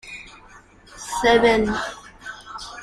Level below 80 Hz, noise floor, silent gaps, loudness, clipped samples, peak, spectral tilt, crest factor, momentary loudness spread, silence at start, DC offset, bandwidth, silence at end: -46 dBFS; -48 dBFS; none; -19 LUFS; under 0.1%; -4 dBFS; -3.5 dB/octave; 20 dB; 21 LU; 0.05 s; under 0.1%; 14 kHz; 0 s